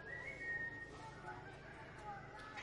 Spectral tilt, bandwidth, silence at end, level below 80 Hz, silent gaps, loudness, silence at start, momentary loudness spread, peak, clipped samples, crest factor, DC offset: -5 dB/octave; 11 kHz; 0 s; -66 dBFS; none; -48 LUFS; 0 s; 11 LU; -36 dBFS; under 0.1%; 14 dB; under 0.1%